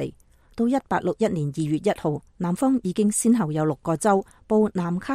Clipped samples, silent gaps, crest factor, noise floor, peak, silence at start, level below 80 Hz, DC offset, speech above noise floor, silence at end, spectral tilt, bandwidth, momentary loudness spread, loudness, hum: under 0.1%; none; 16 dB; -46 dBFS; -8 dBFS; 0 s; -54 dBFS; under 0.1%; 23 dB; 0 s; -6 dB/octave; 15.5 kHz; 7 LU; -23 LUFS; none